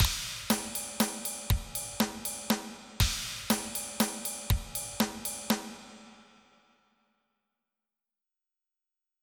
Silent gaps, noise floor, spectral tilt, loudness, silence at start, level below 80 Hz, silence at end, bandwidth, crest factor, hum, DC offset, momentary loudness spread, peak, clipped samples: none; -89 dBFS; -3.5 dB/octave; -32 LUFS; 0 s; -42 dBFS; 3 s; over 20 kHz; 24 dB; none; under 0.1%; 7 LU; -10 dBFS; under 0.1%